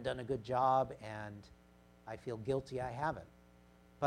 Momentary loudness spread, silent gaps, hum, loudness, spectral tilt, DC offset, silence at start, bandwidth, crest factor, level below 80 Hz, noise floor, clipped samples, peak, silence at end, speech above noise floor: 18 LU; none; 60 Hz at -65 dBFS; -38 LUFS; -6.5 dB/octave; under 0.1%; 0 s; 12.5 kHz; 20 dB; -64 dBFS; -64 dBFS; under 0.1%; -20 dBFS; 0 s; 26 dB